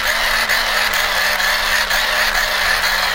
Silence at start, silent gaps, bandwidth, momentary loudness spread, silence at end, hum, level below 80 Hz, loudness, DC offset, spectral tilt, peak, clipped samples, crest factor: 0 s; none; 17 kHz; 1 LU; 0 s; none; -34 dBFS; -15 LUFS; under 0.1%; 0.5 dB/octave; -2 dBFS; under 0.1%; 14 dB